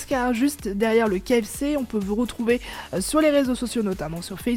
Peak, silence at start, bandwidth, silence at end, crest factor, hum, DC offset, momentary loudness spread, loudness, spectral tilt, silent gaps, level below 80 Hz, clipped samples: -8 dBFS; 0 s; 17.5 kHz; 0 s; 16 dB; none; under 0.1%; 8 LU; -23 LUFS; -5 dB/octave; none; -44 dBFS; under 0.1%